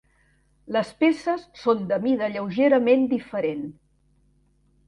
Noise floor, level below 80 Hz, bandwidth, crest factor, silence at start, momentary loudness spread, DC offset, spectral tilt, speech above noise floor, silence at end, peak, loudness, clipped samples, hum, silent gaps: -63 dBFS; -62 dBFS; 11 kHz; 16 dB; 0.7 s; 9 LU; under 0.1%; -7 dB/octave; 41 dB; 1.15 s; -8 dBFS; -23 LUFS; under 0.1%; none; none